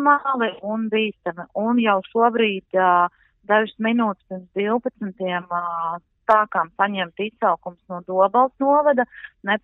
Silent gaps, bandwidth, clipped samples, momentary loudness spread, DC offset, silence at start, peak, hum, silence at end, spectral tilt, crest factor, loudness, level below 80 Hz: none; 4.1 kHz; under 0.1%; 11 LU; under 0.1%; 0 s; -4 dBFS; none; 0.05 s; -3 dB/octave; 18 dB; -21 LUFS; -66 dBFS